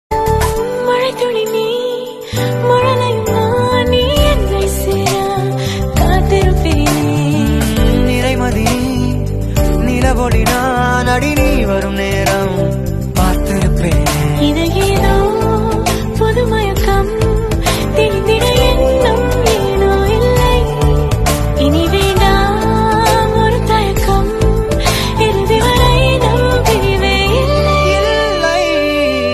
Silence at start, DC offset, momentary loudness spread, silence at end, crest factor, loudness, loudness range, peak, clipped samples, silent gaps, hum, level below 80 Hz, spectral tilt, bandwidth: 0.1 s; under 0.1%; 4 LU; 0 s; 12 dB; -13 LUFS; 2 LU; 0 dBFS; under 0.1%; none; none; -18 dBFS; -5.5 dB/octave; 13.5 kHz